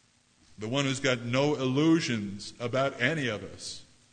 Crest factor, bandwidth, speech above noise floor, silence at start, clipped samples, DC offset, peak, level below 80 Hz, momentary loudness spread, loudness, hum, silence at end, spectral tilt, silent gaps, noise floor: 18 dB; 9.6 kHz; 35 dB; 0.6 s; under 0.1%; under 0.1%; -12 dBFS; -66 dBFS; 15 LU; -29 LUFS; none; 0.3 s; -5 dB/octave; none; -64 dBFS